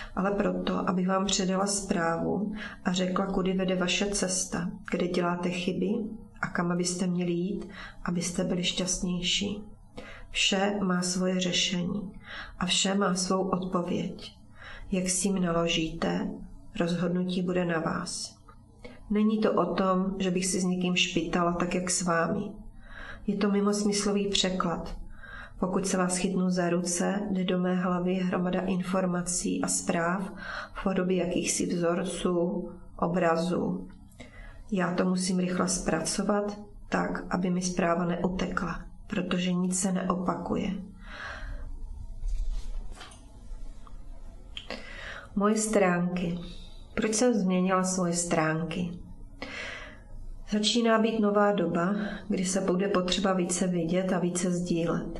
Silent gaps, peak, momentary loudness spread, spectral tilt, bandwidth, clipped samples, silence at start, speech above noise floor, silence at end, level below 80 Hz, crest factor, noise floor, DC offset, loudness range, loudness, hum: none; -10 dBFS; 16 LU; -4.5 dB/octave; 12 kHz; under 0.1%; 0 s; 24 dB; 0 s; -46 dBFS; 18 dB; -52 dBFS; under 0.1%; 4 LU; -28 LUFS; none